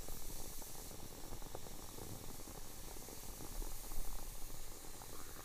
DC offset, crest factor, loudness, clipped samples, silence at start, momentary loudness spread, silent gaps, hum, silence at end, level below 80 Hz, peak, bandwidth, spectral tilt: under 0.1%; 16 dB; -50 LUFS; under 0.1%; 0 s; 3 LU; none; none; 0 s; -48 dBFS; -28 dBFS; 15.5 kHz; -3 dB/octave